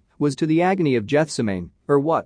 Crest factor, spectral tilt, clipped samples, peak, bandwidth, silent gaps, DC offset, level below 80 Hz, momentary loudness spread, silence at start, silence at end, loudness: 14 dB; -6.5 dB/octave; under 0.1%; -6 dBFS; 10.5 kHz; none; under 0.1%; -58 dBFS; 6 LU; 0.2 s; 0.05 s; -21 LUFS